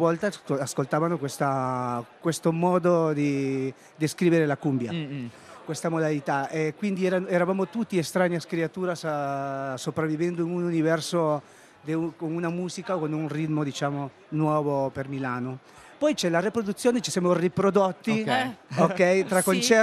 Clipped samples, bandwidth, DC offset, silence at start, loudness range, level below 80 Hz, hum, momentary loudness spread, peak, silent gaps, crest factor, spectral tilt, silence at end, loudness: under 0.1%; 13.5 kHz; under 0.1%; 0 s; 4 LU; -68 dBFS; none; 9 LU; -6 dBFS; none; 20 dB; -5.5 dB/octave; 0 s; -26 LUFS